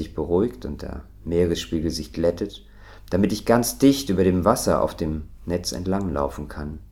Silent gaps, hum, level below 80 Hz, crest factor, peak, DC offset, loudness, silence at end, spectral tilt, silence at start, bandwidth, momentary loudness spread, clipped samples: none; none; -40 dBFS; 22 dB; -2 dBFS; under 0.1%; -23 LUFS; 0.05 s; -5.5 dB/octave; 0 s; 17 kHz; 14 LU; under 0.1%